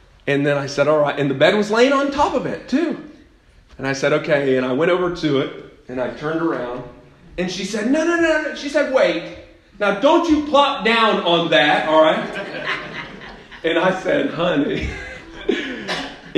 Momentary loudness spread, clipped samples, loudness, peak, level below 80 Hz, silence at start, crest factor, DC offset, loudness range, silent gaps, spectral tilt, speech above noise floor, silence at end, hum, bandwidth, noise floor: 13 LU; under 0.1%; -18 LUFS; 0 dBFS; -46 dBFS; 0.25 s; 18 dB; under 0.1%; 6 LU; none; -5 dB/octave; 32 dB; 0.05 s; none; 11.5 kHz; -50 dBFS